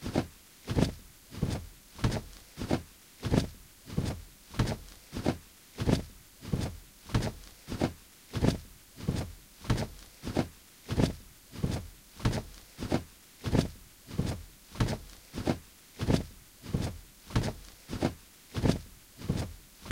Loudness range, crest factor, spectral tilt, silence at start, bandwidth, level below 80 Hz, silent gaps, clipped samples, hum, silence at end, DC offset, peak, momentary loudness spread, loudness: 1 LU; 24 dB; -6 dB/octave; 0 s; 16 kHz; -44 dBFS; none; under 0.1%; none; 0 s; under 0.1%; -10 dBFS; 18 LU; -35 LUFS